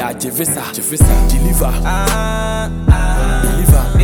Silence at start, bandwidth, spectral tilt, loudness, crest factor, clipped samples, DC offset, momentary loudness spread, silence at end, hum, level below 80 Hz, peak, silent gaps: 0 s; 17.5 kHz; -5 dB/octave; -15 LUFS; 12 dB; under 0.1%; under 0.1%; 6 LU; 0 s; none; -14 dBFS; 0 dBFS; none